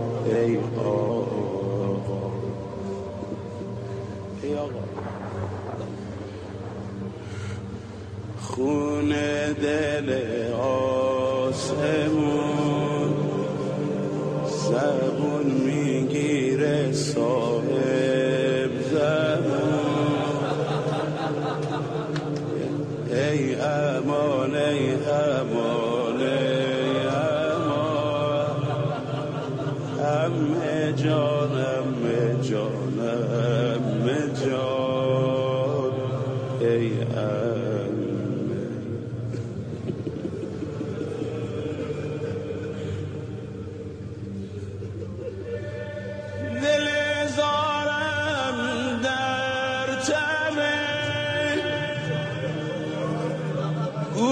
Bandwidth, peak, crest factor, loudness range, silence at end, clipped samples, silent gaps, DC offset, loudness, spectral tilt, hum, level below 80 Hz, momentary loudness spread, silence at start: 10 kHz; -10 dBFS; 16 dB; 9 LU; 0 s; under 0.1%; none; under 0.1%; -26 LUFS; -6 dB/octave; none; -56 dBFS; 11 LU; 0 s